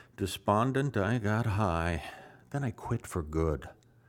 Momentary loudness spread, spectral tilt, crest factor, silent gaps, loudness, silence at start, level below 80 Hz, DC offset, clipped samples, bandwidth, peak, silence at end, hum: 11 LU; -6.5 dB/octave; 20 dB; none; -32 LUFS; 0.2 s; -46 dBFS; under 0.1%; under 0.1%; 16.5 kHz; -12 dBFS; 0.35 s; none